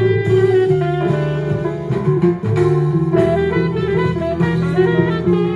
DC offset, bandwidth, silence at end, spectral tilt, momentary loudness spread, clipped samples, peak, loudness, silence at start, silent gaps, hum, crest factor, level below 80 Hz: under 0.1%; 9.8 kHz; 0 s; -9 dB/octave; 5 LU; under 0.1%; -2 dBFS; -16 LUFS; 0 s; none; none; 14 dB; -42 dBFS